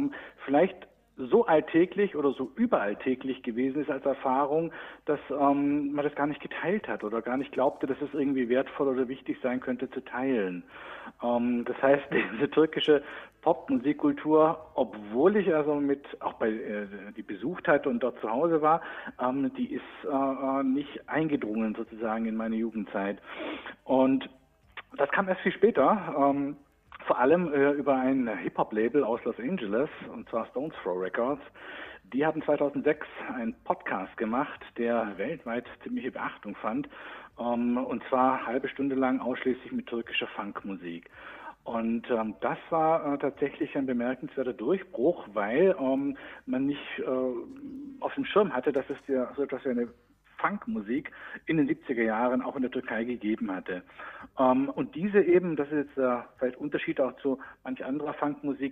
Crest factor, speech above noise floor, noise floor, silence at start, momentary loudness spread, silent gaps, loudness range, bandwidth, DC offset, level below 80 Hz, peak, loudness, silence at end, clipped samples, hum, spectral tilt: 20 dB; 21 dB; -50 dBFS; 0 s; 12 LU; none; 5 LU; 4 kHz; under 0.1%; -66 dBFS; -10 dBFS; -29 LUFS; 0 s; under 0.1%; none; -8.5 dB/octave